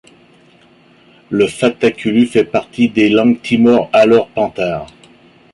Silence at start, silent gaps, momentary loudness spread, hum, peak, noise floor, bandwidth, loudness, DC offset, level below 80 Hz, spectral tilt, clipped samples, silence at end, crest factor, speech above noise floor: 1.3 s; none; 9 LU; none; -2 dBFS; -47 dBFS; 11.5 kHz; -13 LUFS; under 0.1%; -52 dBFS; -6 dB/octave; under 0.1%; 0.7 s; 14 dB; 35 dB